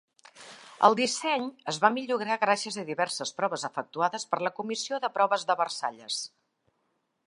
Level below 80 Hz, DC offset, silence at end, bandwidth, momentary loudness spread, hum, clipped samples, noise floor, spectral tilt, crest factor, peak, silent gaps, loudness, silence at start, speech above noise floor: -84 dBFS; under 0.1%; 1 s; 11.5 kHz; 10 LU; none; under 0.1%; -76 dBFS; -2.5 dB/octave; 24 dB; -4 dBFS; none; -28 LUFS; 0.35 s; 48 dB